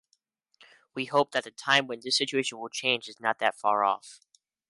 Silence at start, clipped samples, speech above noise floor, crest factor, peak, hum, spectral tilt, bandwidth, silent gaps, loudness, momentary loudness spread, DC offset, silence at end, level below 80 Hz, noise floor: 0.95 s; under 0.1%; 46 dB; 22 dB; -8 dBFS; none; -2.5 dB/octave; 11.5 kHz; none; -27 LUFS; 8 LU; under 0.1%; 0.55 s; -82 dBFS; -74 dBFS